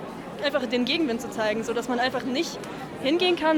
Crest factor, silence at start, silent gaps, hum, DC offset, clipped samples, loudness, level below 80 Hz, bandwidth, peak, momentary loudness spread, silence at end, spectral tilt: 16 dB; 0 s; none; none; under 0.1%; under 0.1%; -26 LUFS; -58 dBFS; 19.5 kHz; -10 dBFS; 8 LU; 0 s; -4 dB/octave